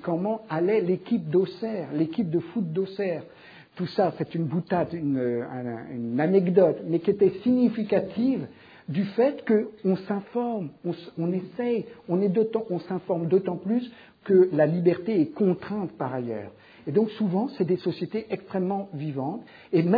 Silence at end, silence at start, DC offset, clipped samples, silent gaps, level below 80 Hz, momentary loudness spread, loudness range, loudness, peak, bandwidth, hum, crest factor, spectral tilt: 0 s; 0 s; under 0.1%; under 0.1%; none; -68 dBFS; 11 LU; 4 LU; -26 LUFS; -6 dBFS; 5 kHz; none; 20 dB; -10.5 dB/octave